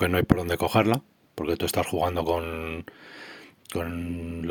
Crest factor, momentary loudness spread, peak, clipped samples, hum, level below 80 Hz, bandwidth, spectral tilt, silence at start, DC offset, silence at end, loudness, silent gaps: 26 dB; 21 LU; -2 dBFS; under 0.1%; none; -44 dBFS; 19 kHz; -5.5 dB/octave; 0 s; under 0.1%; 0 s; -27 LUFS; none